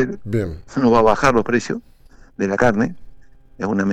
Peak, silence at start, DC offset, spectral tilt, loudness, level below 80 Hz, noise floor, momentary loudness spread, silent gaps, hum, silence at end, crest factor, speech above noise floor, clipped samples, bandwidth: -4 dBFS; 0 s; under 0.1%; -6.5 dB/octave; -19 LUFS; -40 dBFS; -43 dBFS; 12 LU; none; none; 0 s; 16 dB; 26 dB; under 0.1%; 9.6 kHz